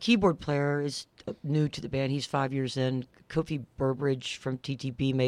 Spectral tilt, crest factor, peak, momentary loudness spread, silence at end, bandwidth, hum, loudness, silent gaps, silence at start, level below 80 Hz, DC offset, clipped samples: -6 dB/octave; 18 dB; -10 dBFS; 8 LU; 0 s; 11 kHz; none; -30 LUFS; none; 0 s; -56 dBFS; under 0.1%; under 0.1%